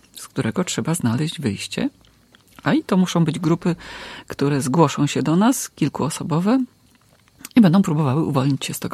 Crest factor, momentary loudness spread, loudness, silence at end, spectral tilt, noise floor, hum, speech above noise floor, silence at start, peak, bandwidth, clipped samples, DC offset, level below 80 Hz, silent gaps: 18 dB; 10 LU; -20 LUFS; 0 s; -6 dB/octave; -55 dBFS; none; 36 dB; 0.15 s; -2 dBFS; 15.5 kHz; under 0.1%; under 0.1%; -56 dBFS; none